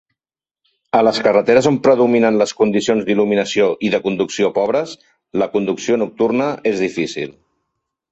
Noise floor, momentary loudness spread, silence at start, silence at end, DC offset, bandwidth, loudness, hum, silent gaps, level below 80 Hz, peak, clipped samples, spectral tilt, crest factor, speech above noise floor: under -90 dBFS; 8 LU; 0.95 s; 0.8 s; under 0.1%; 8.2 kHz; -16 LUFS; none; none; -58 dBFS; 0 dBFS; under 0.1%; -5 dB/octave; 16 dB; over 74 dB